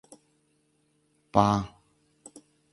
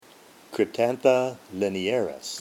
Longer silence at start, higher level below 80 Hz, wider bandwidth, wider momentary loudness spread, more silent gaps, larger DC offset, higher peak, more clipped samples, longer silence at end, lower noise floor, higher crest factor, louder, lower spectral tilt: first, 1.35 s vs 0.5 s; first, -54 dBFS vs -72 dBFS; second, 11.5 kHz vs 17 kHz; first, 27 LU vs 9 LU; neither; neither; about the same, -4 dBFS vs -6 dBFS; neither; first, 1.05 s vs 0 s; first, -70 dBFS vs -52 dBFS; first, 28 dB vs 20 dB; about the same, -26 LUFS vs -25 LUFS; first, -6.5 dB/octave vs -4.5 dB/octave